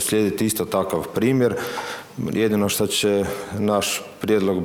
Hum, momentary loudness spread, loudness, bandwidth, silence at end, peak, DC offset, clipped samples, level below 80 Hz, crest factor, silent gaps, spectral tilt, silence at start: none; 7 LU; -22 LUFS; over 20 kHz; 0 s; -8 dBFS; under 0.1%; under 0.1%; -54 dBFS; 14 dB; none; -4.5 dB/octave; 0 s